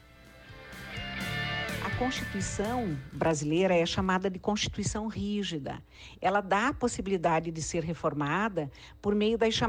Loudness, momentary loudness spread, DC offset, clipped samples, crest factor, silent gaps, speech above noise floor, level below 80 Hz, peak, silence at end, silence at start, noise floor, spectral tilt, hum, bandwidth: -30 LUFS; 12 LU; under 0.1%; under 0.1%; 16 dB; none; 23 dB; -50 dBFS; -14 dBFS; 0 s; 0.2 s; -53 dBFS; -4.5 dB/octave; none; 16.5 kHz